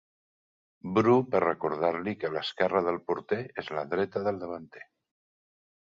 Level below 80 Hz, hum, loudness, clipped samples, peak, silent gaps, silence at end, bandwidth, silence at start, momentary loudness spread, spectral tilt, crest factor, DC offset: -66 dBFS; none; -29 LUFS; under 0.1%; -10 dBFS; none; 1 s; 7.4 kHz; 0.85 s; 13 LU; -7.5 dB/octave; 20 dB; under 0.1%